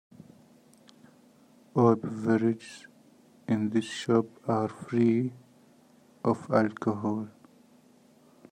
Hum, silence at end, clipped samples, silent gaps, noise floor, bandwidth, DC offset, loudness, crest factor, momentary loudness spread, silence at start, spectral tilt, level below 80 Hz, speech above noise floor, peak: none; 1.2 s; under 0.1%; none; -59 dBFS; 10 kHz; under 0.1%; -28 LUFS; 20 dB; 12 LU; 1.75 s; -7.5 dB/octave; -72 dBFS; 32 dB; -10 dBFS